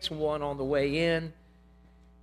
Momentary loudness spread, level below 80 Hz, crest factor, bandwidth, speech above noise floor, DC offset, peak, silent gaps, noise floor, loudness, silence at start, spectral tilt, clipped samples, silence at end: 6 LU; -52 dBFS; 16 dB; 13.5 kHz; 28 dB; under 0.1%; -16 dBFS; none; -57 dBFS; -29 LUFS; 0 s; -6 dB/octave; under 0.1%; 0.9 s